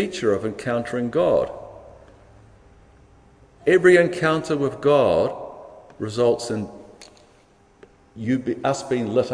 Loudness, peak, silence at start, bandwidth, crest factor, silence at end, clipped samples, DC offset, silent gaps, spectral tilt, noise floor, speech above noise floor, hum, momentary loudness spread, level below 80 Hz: -21 LUFS; -2 dBFS; 0 s; 10.5 kHz; 20 dB; 0 s; under 0.1%; under 0.1%; none; -6 dB/octave; -55 dBFS; 35 dB; none; 19 LU; -54 dBFS